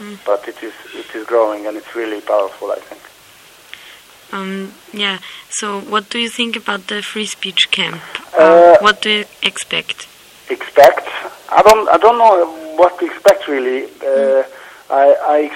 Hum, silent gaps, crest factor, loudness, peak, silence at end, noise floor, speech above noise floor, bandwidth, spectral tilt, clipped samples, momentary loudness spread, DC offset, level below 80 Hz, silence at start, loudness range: none; none; 14 dB; -13 LUFS; 0 dBFS; 0 s; -43 dBFS; 29 dB; 17 kHz; -3 dB/octave; 0.4%; 17 LU; under 0.1%; -54 dBFS; 0 s; 11 LU